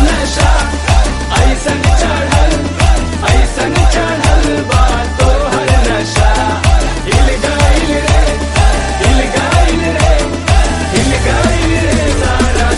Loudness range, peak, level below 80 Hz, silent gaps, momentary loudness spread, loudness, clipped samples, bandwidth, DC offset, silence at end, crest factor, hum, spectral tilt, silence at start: 0 LU; 0 dBFS; -12 dBFS; none; 2 LU; -12 LUFS; 0.3%; 11.5 kHz; under 0.1%; 0 s; 10 dB; none; -5 dB/octave; 0 s